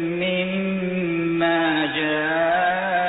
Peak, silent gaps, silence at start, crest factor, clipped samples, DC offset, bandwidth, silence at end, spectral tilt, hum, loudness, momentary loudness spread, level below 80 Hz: -10 dBFS; none; 0 s; 12 dB; under 0.1%; under 0.1%; 4.1 kHz; 0 s; -10 dB/octave; none; -21 LUFS; 4 LU; -58 dBFS